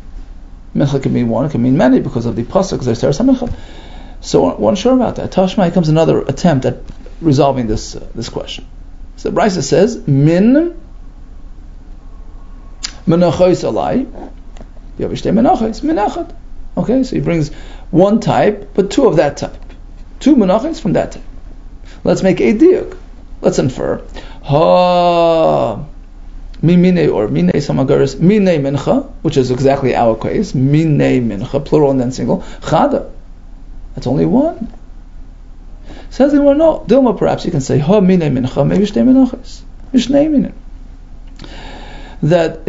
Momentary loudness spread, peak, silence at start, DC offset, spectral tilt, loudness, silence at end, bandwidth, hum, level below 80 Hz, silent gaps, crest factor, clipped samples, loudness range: 15 LU; 0 dBFS; 0 s; under 0.1%; -7 dB/octave; -13 LUFS; 0 s; 7.8 kHz; none; -30 dBFS; none; 14 dB; under 0.1%; 4 LU